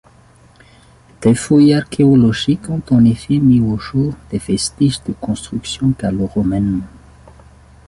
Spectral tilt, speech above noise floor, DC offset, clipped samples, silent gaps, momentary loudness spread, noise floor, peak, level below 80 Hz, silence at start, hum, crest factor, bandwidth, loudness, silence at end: -6.5 dB/octave; 33 dB; under 0.1%; under 0.1%; none; 11 LU; -47 dBFS; -2 dBFS; -40 dBFS; 1.2 s; none; 14 dB; 11.5 kHz; -15 LUFS; 1 s